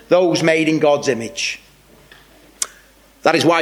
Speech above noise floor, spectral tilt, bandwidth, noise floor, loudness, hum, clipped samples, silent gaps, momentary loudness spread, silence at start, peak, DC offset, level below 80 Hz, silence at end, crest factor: 33 dB; -4 dB/octave; 16 kHz; -49 dBFS; -17 LUFS; none; under 0.1%; none; 11 LU; 0.1 s; 0 dBFS; under 0.1%; -58 dBFS; 0 s; 18 dB